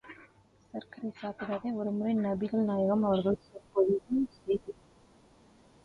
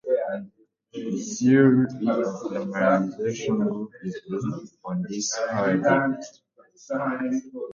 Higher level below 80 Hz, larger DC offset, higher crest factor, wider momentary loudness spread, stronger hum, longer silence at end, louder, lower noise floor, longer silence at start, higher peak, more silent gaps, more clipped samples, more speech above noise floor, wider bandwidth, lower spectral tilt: about the same, -64 dBFS vs -66 dBFS; neither; about the same, 16 dB vs 18 dB; first, 17 LU vs 14 LU; neither; first, 1.1 s vs 0 s; second, -31 LUFS vs -25 LUFS; first, -62 dBFS vs -54 dBFS; about the same, 0.05 s vs 0.05 s; second, -16 dBFS vs -6 dBFS; neither; neither; about the same, 31 dB vs 30 dB; second, 5.8 kHz vs 7.6 kHz; first, -9 dB/octave vs -5.5 dB/octave